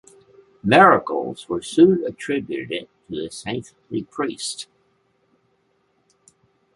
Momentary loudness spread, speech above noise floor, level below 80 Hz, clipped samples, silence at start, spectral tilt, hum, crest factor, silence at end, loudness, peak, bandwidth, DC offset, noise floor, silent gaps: 18 LU; 46 dB; -60 dBFS; under 0.1%; 0.65 s; -5 dB/octave; none; 20 dB; 2.1 s; -20 LUFS; -2 dBFS; 11.5 kHz; under 0.1%; -66 dBFS; none